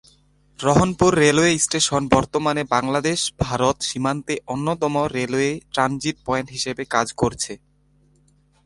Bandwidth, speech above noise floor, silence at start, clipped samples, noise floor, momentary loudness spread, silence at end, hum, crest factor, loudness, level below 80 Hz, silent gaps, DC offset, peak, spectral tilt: 11.5 kHz; 39 dB; 0.6 s; under 0.1%; -59 dBFS; 10 LU; 1.1 s; 50 Hz at -50 dBFS; 20 dB; -20 LUFS; -44 dBFS; none; under 0.1%; 0 dBFS; -4 dB/octave